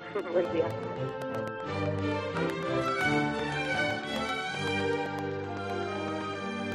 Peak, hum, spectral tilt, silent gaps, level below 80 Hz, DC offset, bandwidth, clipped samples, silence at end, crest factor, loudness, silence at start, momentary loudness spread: -16 dBFS; none; -5.5 dB/octave; none; -62 dBFS; under 0.1%; 14 kHz; under 0.1%; 0 s; 16 dB; -31 LUFS; 0 s; 7 LU